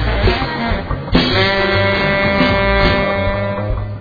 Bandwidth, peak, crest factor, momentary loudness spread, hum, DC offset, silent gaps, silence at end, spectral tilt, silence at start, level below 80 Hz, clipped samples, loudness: 5 kHz; 0 dBFS; 14 dB; 7 LU; none; under 0.1%; none; 0 s; -7 dB/octave; 0 s; -24 dBFS; under 0.1%; -15 LUFS